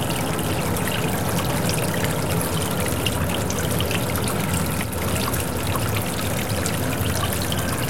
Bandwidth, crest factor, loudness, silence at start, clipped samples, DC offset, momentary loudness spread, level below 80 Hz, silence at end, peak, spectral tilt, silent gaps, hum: 17 kHz; 18 dB; -23 LUFS; 0 s; under 0.1%; 2%; 2 LU; -40 dBFS; 0 s; -6 dBFS; -4.5 dB/octave; none; none